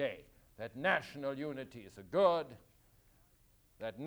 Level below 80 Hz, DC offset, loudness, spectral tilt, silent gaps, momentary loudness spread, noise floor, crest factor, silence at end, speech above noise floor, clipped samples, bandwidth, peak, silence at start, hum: -70 dBFS; under 0.1%; -36 LUFS; -6 dB/octave; none; 19 LU; -69 dBFS; 22 dB; 0 s; 32 dB; under 0.1%; over 20 kHz; -16 dBFS; 0 s; none